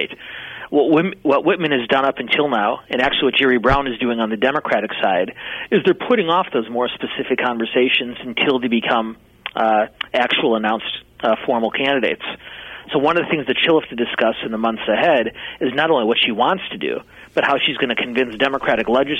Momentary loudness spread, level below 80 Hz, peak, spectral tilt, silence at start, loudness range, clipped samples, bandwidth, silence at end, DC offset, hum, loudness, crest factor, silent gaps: 9 LU; -46 dBFS; -4 dBFS; -6 dB/octave; 0 s; 2 LU; under 0.1%; 8.8 kHz; 0 s; under 0.1%; none; -18 LUFS; 14 dB; none